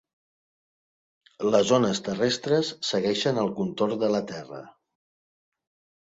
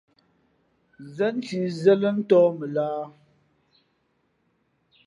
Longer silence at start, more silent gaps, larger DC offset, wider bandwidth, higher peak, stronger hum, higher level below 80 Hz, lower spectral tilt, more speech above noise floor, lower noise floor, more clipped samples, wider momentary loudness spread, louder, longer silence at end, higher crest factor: first, 1.4 s vs 1 s; neither; neither; second, 7.8 kHz vs 10.5 kHz; about the same, -8 dBFS vs -6 dBFS; neither; first, -66 dBFS vs -76 dBFS; second, -4.5 dB/octave vs -7.5 dB/octave; first, over 65 dB vs 48 dB; first, under -90 dBFS vs -70 dBFS; neither; about the same, 12 LU vs 14 LU; about the same, -25 LUFS vs -23 LUFS; second, 1.35 s vs 1.95 s; about the same, 20 dB vs 20 dB